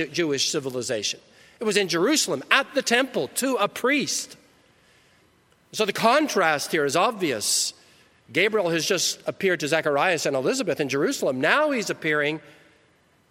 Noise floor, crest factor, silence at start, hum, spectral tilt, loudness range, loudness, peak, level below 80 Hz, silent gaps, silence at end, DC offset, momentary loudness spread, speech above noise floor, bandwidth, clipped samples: -61 dBFS; 22 dB; 0 s; none; -2.5 dB/octave; 2 LU; -23 LUFS; -2 dBFS; -72 dBFS; none; 0.9 s; under 0.1%; 7 LU; 38 dB; 16.5 kHz; under 0.1%